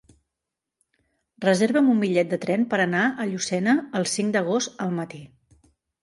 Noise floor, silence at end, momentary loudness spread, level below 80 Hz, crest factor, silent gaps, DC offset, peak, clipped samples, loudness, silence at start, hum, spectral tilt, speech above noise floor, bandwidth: -85 dBFS; 0.75 s; 9 LU; -68 dBFS; 18 dB; none; under 0.1%; -8 dBFS; under 0.1%; -23 LUFS; 1.4 s; none; -5 dB/octave; 63 dB; 11.5 kHz